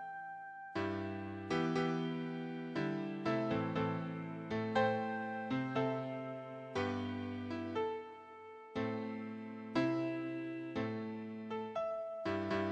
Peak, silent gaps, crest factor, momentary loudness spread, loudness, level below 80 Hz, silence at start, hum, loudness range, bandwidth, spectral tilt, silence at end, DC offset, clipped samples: -20 dBFS; none; 20 dB; 10 LU; -39 LUFS; -74 dBFS; 0 s; none; 4 LU; 8.8 kHz; -7 dB/octave; 0 s; under 0.1%; under 0.1%